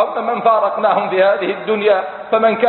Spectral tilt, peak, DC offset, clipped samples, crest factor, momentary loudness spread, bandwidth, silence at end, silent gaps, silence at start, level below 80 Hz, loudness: -10 dB/octave; -2 dBFS; under 0.1%; under 0.1%; 14 dB; 4 LU; 4.3 kHz; 0 s; none; 0 s; -64 dBFS; -15 LUFS